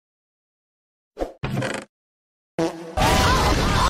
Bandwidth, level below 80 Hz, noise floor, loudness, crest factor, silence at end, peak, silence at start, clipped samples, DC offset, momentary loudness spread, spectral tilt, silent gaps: 16 kHz; -32 dBFS; under -90 dBFS; -22 LUFS; 18 dB; 0 s; -6 dBFS; 1.15 s; under 0.1%; under 0.1%; 15 LU; -4.5 dB/octave; 1.89-2.58 s